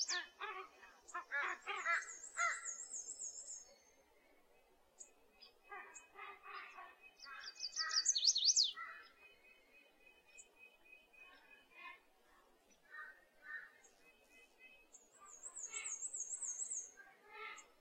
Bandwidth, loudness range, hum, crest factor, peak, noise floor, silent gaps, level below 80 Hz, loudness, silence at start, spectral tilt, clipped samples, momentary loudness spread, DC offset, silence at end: 16 kHz; 22 LU; none; 26 dB; -20 dBFS; -71 dBFS; none; -86 dBFS; -40 LUFS; 0 s; 4 dB/octave; under 0.1%; 27 LU; under 0.1%; 0.15 s